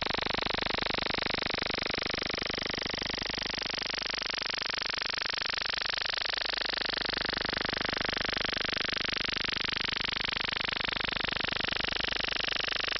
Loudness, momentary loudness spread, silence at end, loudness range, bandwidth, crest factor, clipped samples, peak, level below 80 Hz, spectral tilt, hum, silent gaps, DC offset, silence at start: -30 LUFS; 2 LU; 0 s; 1 LU; 9.6 kHz; 14 dB; under 0.1%; -18 dBFS; -52 dBFS; -3 dB/octave; none; none; under 0.1%; 0 s